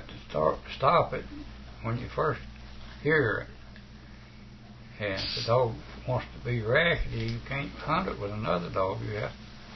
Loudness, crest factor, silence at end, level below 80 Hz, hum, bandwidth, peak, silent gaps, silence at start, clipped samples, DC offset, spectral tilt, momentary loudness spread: -29 LUFS; 22 dB; 0 s; -46 dBFS; none; 6.2 kHz; -8 dBFS; none; 0 s; under 0.1%; under 0.1%; -6.5 dB/octave; 24 LU